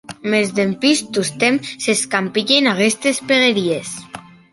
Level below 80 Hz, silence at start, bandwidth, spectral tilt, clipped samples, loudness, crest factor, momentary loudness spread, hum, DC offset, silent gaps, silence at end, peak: -62 dBFS; 0.1 s; 12 kHz; -3 dB/octave; under 0.1%; -16 LUFS; 16 dB; 10 LU; none; under 0.1%; none; 0.35 s; -2 dBFS